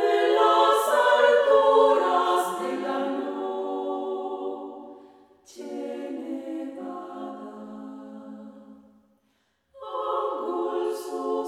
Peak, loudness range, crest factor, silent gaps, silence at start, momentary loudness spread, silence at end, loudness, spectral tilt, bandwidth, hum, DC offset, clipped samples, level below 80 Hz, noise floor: -8 dBFS; 17 LU; 18 dB; none; 0 s; 22 LU; 0 s; -24 LUFS; -3 dB/octave; 16 kHz; none; under 0.1%; under 0.1%; -76 dBFS; -70 dBFS